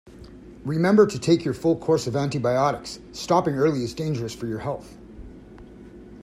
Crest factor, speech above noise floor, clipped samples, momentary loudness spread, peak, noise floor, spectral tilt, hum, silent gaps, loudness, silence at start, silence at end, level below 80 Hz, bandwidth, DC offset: 20 dB; 21 dB; under 0.1%; 25 LU; -4 dBFS; -44 dBFS; -6.5 dB/octave; none; none; -23 LUFS; 0.05 s; 0 s; -50 dBFS; 14 kHz; under 0.1%